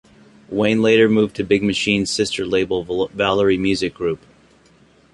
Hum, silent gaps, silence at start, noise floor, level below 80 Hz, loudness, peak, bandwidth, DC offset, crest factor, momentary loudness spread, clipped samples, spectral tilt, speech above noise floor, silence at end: none; none; 0.5 s; -53 dBFS; -48 dBFS; -18 LUFS; -2 dBFS; 11.5 kHz; under 0.1%; 18 dB; 10 LU; under 0.1%; -5 dB/octave; 35 dB; 0.95 s